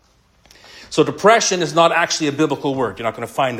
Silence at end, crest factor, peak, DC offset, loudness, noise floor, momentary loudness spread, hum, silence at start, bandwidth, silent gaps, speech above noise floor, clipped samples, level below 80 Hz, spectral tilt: 0 s; 18 dB; 0 dBFS; under 0.1%; -17 LUFS; -55 dBFS; 10 LU; none; 0.75 s; 16 kHz; none; 38 dB; under 0.1%; -56 dBFS; -3.5 dB/octave